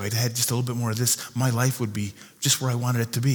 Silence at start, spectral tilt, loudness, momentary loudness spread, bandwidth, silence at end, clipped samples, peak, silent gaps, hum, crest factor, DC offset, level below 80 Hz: 0 s; -4 dB/octave; -24 LUFS; 6 LU; over 20 kHz; 0 s; under 0.1%; -6 dBFS; none; none; 18 dB; under 0.1%; -66 dBFS